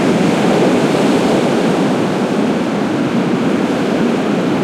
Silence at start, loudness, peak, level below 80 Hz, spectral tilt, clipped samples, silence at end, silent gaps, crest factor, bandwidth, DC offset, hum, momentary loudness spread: 0 s; -14 LUFS; -2 dBFS; -50 dBFS; -6 dB/octave; under 0.1%; 0 s; none; 10 dB; 15 kHz; under 0.1%; none; 3 LU